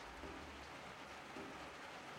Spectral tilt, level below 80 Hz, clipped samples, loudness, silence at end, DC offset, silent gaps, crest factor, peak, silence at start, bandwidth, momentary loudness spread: -3.5 dB/octave; -66 dBFS; under 0.1%; -52 LUFS; 0 s; under 0.1%; none; 14 dB; -38 dBFS; 0 s; 16 kHz; 1 LU